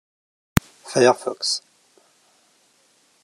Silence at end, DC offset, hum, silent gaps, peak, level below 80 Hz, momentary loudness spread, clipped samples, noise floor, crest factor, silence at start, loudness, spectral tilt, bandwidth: 1.65 s; under 0.1%; none; none; 0 dBFS; -46 dBFS; 8 LU; under 0.1%; -61 dBFS; 26 dB; 0.55 s; -21 LUFS; -4 dB/octave; 13 kHz